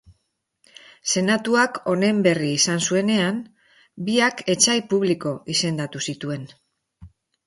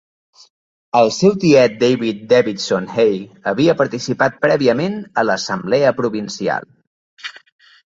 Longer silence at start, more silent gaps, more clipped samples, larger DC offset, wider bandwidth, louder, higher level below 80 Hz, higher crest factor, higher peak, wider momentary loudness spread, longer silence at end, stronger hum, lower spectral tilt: about the same, 1.05 s vs 0.95 s; second, none vs 6.87-7.17 s; neither; neither; first, 11.5 kHz vs 7.8 kHz; second, -21 LUFS vs -16 LUFS; about the same, -62 dBFS vs -58 dBFS; about the same, 20 dB vs 16 dB; about the same, -4 dBFS vs -2 dBFS; about the same, 11 LU vs 10 LU; second, 0.4 s vs 0.65 s; neither; second, -3.5 dB/octave vs -5.5 dB/octave